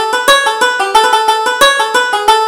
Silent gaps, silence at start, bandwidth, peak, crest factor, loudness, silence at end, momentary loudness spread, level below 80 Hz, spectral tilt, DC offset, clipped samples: none; 0 s; 18.5 kHz; 0 dBFS; 10 dB; -9 LUFS; 0 s; 3 LU; -46 dBFS; 0.5 dB/octave; under 0.1%; 0.2%